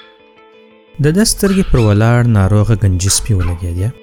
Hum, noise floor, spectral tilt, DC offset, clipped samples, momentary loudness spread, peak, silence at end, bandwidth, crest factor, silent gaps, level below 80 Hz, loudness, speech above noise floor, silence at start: none; -44 dBFS; -5.5 dB/octave; under 0.1%; under 0.1%; 6 LU; 0 dBFS; 0.1 s; 17.5 kHz; 12 dB; none; -26 dBFS; -13 LUFS; 32 dB; 1 s